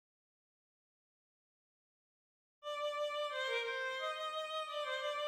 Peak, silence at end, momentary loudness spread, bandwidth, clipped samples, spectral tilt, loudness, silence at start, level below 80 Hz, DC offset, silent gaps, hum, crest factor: -26 dBFS; 0 s; 4 LU; 16 kHz; under 0.1%; 1.5 dB/octave; -39 LUFS; 2.65 s; under -90 dBFS; under 0.1%; none; none; 16 dB